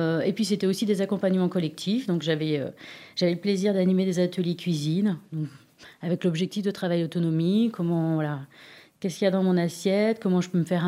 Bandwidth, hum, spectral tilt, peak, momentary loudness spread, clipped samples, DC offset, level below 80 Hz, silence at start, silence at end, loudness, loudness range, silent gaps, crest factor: 15 kHz; none; -6.5 dB/octave; -10 dBFS; 10 LU; under 0.1%; under 0.1%; -72 dBFS; 0 s; 0 s; -26 LUFS; 1 LU; none; 16 dB